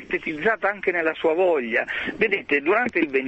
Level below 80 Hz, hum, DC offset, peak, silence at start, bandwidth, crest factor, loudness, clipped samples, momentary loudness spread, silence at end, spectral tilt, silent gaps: -58 dBFS; none; under 0.1%; -6 dBFS; 0 s; 8.2 kHz; 16 dB; -22 LUFS; under 0.1%; 3 LU; 0 s; -6 dB/octave; none